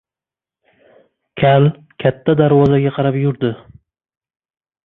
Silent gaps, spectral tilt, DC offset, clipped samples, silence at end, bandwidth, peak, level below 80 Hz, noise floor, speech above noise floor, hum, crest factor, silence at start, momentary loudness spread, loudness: none; -10 dB/octave; under 0.1%; under 0.1%; 1.3 s; 4 kHz; -2 dBFS; -50 dBFS; -90 dBFS; 76 dB; none; 16 dB; 1.35 s; 10 LU; -15 LUFS